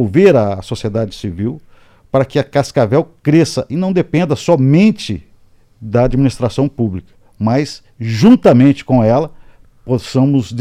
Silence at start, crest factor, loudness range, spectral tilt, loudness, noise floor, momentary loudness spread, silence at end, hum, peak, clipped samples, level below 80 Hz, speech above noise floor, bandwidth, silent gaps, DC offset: 0 s; 14 dB; 3 LU; -7.5 dB/octave; -14 LUFS; -47 dBFS; 13 LU; 0 s; none; 0 dBFS; under 0.1%; -38 dBFS; 34 dB; 12.5 kHz; none; under 0.1%